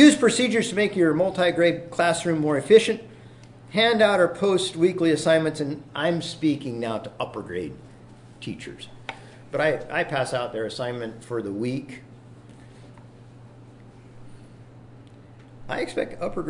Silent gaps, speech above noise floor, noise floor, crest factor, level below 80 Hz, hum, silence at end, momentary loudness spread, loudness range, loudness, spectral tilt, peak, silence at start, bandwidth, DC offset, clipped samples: none; 24 dB; -47 dBFS; 22 dB; -56 dBFS; none; 0 s; 18 LU; 14 LU; -23 LUFS; -4.5 dB/octave; -2 dBFS; 0 s; 11 kHz; under 0.1%; under 0.1%